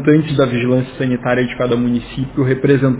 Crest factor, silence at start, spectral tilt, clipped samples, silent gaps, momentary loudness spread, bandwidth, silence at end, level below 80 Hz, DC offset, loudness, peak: 14 dB; 0 s; -12 dB/octave; under 0.1%; none; 6 LU; 4 kHz; 0 s; -42 dBFS; under 0.1%; -16 LUFS; -2 dBFS